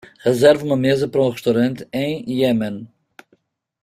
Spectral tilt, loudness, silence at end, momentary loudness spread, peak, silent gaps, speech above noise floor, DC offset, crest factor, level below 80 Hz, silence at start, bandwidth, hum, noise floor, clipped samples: -6.5 dB/octave; -18 LUFS; 0.95 s; 9 LU; -2 dBFS; none; 44 dB; under 0.1%; 18 dB; -56 dBFS; 0.25 s; 15.5 kHz; none; -62 dBFS; under 0.1%